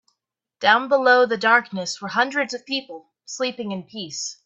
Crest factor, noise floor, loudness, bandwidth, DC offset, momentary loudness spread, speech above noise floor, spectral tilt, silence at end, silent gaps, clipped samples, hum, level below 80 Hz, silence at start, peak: 22 dB; -78 dBFS; -20 LUFS; 8.4 kHz; under 0.1%; 15 LU; 57 dB; -2.5 dB/octave; 0.1 s; none; under 0.1%; none; -74 dBFS; 0.6 s; 0 dBFS